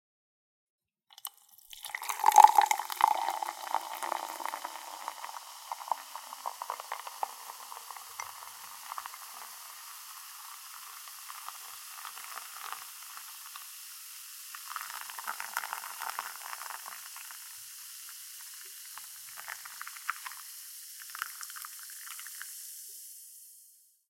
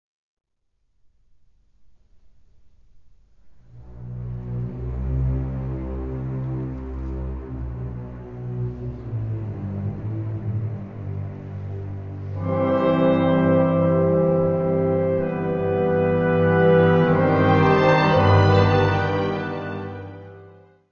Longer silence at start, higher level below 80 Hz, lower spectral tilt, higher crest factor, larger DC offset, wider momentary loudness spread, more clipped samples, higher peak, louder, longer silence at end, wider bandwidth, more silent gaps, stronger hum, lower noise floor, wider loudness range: second, 1.25 s vs 3.45 s; second, under -90 dBFS vs -38 dBFS; second, 2.5 dB/octave vs -9 dB/octave; first, 34 dB vs 18 dB; second, under 0.1% vs 0.2%; second, 13 LU vs 16 LU; neither; about the same, -2 dBFS vs -4 dBFS; second, -35 LUFS vs -21 LUFS; about the same, 0.35 s vs 0.4 s; first, 17 kHz vs 6.6 kHz; neither; neither; second, -61 dBFS vs -70 dBFS; first, 16 LU vs 13 LU